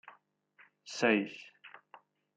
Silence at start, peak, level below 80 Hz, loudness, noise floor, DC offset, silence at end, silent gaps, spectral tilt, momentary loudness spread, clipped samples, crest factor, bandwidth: 0.05 s; -12 dBFS; -84 dBFS; -32 LUFS; -66 dBFS; under 0.1%; 0.6 s; none; -4.5 dB/octave; 25 LU; under 0.1%; 24 dB; 9.2 kHz